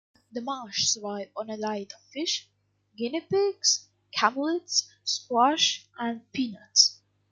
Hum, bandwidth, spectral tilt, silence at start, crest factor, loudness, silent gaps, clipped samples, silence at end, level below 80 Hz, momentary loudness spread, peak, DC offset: 50 Hz at -65 dBFS; 11 kHz; -1 dB/octave; 0.35 s; 24 dB; -26 LUFS; none; under 0.1%; 0.4 s; -76 dBFS; 14 LU; -6 dBFS; under 0.1%